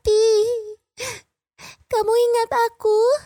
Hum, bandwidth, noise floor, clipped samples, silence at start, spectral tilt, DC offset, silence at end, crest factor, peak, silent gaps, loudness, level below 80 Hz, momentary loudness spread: none; 19 kHz; -47 dBFS; under 0.1%; 0.05 s; -2.5 dB/octave; under 0.1%; 0.05 s; 10 dB; -8 dBFS; none; -20 LUFS; -50 dBFS; 14 LU